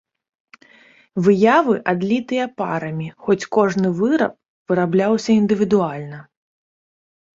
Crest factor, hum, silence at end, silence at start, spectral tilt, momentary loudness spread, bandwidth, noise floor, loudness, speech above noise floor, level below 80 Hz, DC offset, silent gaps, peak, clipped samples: 18 dB; none; 1.15 s; 1.15 s; -7 dB/octave; 12 LU; 7.8 kHz; -51 dBFS; -18 LUFS; 33 dB; -60 dBFS; under 0.1%; 4.48-4.66 s; -2 dBFS; under 0.1%